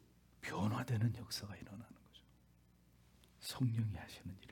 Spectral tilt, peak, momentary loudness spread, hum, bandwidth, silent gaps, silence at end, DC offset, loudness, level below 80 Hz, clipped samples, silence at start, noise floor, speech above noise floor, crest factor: -6 dB/octave; -26 dBFS; 16 LU; 60 Hz at -65 dBFS; 18 kHz; none; 0 s; under 0.1%; -42 LUFS; -70 dBFS; under 0.1%; 0.4 s; -69 dBFS; 28 dB; 18 dB